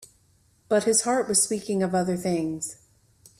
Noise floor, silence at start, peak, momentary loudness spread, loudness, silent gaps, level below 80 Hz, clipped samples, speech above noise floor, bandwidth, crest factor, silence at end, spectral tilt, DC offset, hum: -63 dBFS; 0 s; -8 dBFS; 9 LU; -24 LUFS; none; -64 dBFS; under 0.1%; 38 dB; 15 kHz; 18 dB; 0.65 s; -3.5 dB/octave; under 0.1%; none